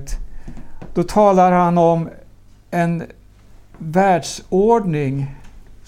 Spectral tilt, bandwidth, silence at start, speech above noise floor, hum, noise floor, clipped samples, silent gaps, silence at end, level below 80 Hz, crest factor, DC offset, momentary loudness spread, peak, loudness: -7 dB/octave; 14.5 kHz; 0 s; 29 dB; none; -44 dBFS; under 0.1%; none; 0.15 s; -36 dBFS; 16 dB; under 0.1%; 20 LU; -2 dBFS; -17 LUFS